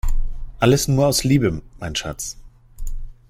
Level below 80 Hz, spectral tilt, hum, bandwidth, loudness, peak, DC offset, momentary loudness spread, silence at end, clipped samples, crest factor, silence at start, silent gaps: -26 dBFS; -5 dB/octave; none; 16 kHz; -20 LUFS; -2 dBFS; under 0.1%; 20 LU; 0.2 s; under 0.1%; 18 dB; 0.05 s; none